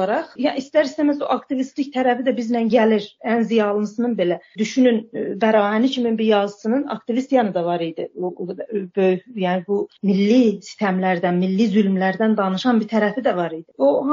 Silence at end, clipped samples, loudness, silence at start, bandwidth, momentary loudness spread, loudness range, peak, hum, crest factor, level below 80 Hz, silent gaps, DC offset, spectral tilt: 0 s; under 0.1%; -20 LUFS; 0 s; 7.6 kHz; 8 LU; 3 LU; -4 dBFS; none; 14 dB; -68 dBFS; none; under 0.1%; -6.5 dB/octave